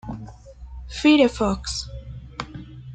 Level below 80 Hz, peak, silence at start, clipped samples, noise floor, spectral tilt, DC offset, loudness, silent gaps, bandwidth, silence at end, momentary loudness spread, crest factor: -40 dBFS; -4 dBFS; 0.05 s; under 0.1%; -41 dBFS; -5 dB/octave; under 0.1%; -20 LUFS; none; 9.2 kHz; 0 s; 24 LU; 20 dB